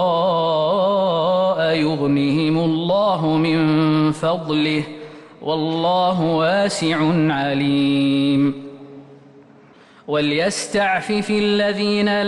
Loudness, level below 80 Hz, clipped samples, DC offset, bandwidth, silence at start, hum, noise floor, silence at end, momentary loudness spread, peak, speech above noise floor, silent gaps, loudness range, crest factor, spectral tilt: -18 LUFS; -56 dBFS; under 0.1%; under 0.1%; 11.5 kHz; 0 s; none; -47 dBFS; 0 s; 5 LU; -8 dBFS; 29 dB; none; 3 LU; 10 dB; -6 dB/octave